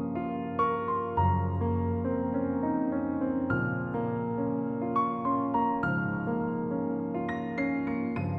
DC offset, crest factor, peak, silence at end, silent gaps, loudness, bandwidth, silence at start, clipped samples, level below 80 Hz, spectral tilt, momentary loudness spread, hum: under 0.1%; 14 dB; -14 dBFS; 0 s; none; -30 LUFS; 4.8 kHz; 0 s; under 0.1%; -54 dBFS; -10.5 dB/octave; 4 LU; none